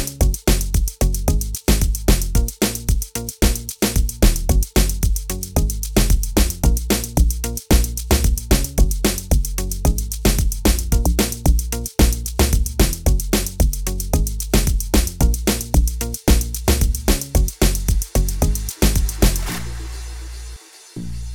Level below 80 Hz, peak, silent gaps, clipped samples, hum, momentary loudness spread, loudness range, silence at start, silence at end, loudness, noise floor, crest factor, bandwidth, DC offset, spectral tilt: -20 dBFS; -4 dBFS; none; under 0.1%; none; 6 LU; 1 LU; 0 s; 0 s; -20 LUFS; -37 dBFS; 14 dB; over 20 kHz; 0.2%; -4.5 dB/octave